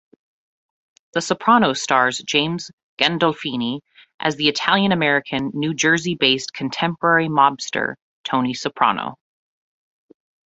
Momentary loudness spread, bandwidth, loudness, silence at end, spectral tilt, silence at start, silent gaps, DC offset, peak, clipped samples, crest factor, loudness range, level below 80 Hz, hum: 10 LU; 8.2 kHz; -19 LUFS; 1.3 s; -3.5 dB/octave; 1.15 s; 2.73-2.97 s, 4.14-4.19 s, 8.02-8.24 s; under 0.1%; -2 dBFS; under 0.1%; 20 dB; 2 LU; -62 dBFS; none